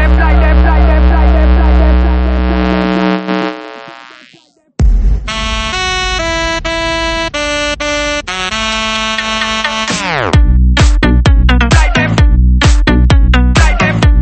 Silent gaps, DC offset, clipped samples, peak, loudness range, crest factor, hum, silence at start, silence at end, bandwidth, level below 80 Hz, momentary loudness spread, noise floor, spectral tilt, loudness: none; under 0.1%; under 0.1%; 0 dBFS; 6 LU; 10 dB; none; 0 s; 0 s; 8.8 kHz; -12 dBFS; 6 LU; -46 dBFS; -5 dB/octave; -11 LUFS